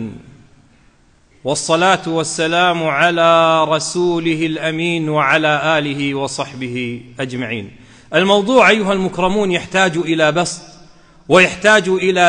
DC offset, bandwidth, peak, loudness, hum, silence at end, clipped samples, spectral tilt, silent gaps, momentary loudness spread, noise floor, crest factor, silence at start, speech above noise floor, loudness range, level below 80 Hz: under 0.1%; 10.5 kHz; 0 dBFS; -15 LUFS; none; 0 s; under 0.1%; -4 dB/octave; none; 12 LU; -51 dBFS; 16 dB; 0 s; 37 dB; 3 LU; -50 dBFS